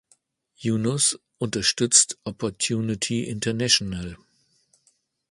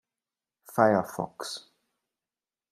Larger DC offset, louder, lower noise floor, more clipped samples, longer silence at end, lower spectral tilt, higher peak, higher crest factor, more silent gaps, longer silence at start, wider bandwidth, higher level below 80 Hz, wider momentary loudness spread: neither; first, -22 LUFS vs -28 LUFS; second, -67 dBFS vs under -90 dBFS; neither; about the same, 1.15 s vs 1.15 s; second, -2.5 dB/octave vs -5 dB/octave; first, -2 dBFS vs -6 dBFS; about the same, 24 dB vs 26 dB; neither; about the same, 0.6 s vs 0.7 s; second, 11.5 kHz vs 15.5 kHz; first, -54 dBFS vs -72 dBFS; about the same, 14 LU vs 14 LU